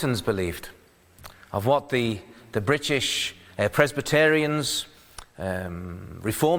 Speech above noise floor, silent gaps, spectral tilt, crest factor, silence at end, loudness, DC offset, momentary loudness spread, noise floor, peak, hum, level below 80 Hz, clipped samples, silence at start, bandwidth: 25 dB; none; -4.5 dB/octave; 24 dB; 0 s; -25 LUFS; under 0.1%; 17 LU; -50 dBFS; -2 dBFS; none; -52 dBFS; under 0.1%; 0 s; over 20 kHz